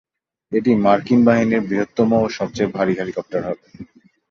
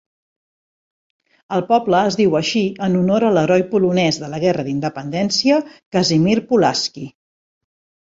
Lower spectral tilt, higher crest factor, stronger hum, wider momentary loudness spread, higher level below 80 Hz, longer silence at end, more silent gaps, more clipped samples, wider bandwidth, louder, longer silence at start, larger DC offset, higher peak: first, -7 dB/octave vs -5.5 dB/octave; about the same, 16 dB vs 16 dB; neither; about the same, 10 LU vs 8 LU; about the same, -54 dBFS vs -56 dBFS; second, 0.5 s vs 1 s; second, none vs 5.86-5.92 s; neither; second, 7 kHz vs 7.8 kHz; about the same, -18 LUFS vs -17 LUFS; second, 0.5 s vs 1.5 s; neither; about the same, -2 dBFS vs -2 dBFS